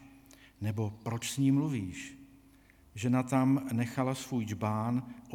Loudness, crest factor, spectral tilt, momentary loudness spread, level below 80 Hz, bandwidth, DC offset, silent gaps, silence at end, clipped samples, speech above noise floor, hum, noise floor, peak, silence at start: -32 LUFS; 16 dB; -6.5 dB/octave; 11 LU; -66 dBFS; 17.5 kHz; under 0.1%; none; 0 s; under 0.1%; 29 dB; none; -60 dBFS; -16 dBFS; 0 s